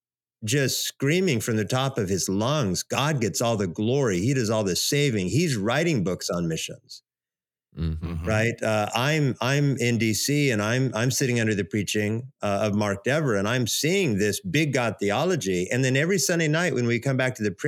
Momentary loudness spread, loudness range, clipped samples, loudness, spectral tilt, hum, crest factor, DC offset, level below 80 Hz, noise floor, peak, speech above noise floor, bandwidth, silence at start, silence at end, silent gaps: 5 LU; 4 LU; under 0.1%; -24 LUFS; -4.5 dB/octave; none; 16 dB; under 0.1%; -50 dBFS; under -90 dBFS; -8 dBFS; over 66 dB; 17 kHz; 0.4 s; 0 s; none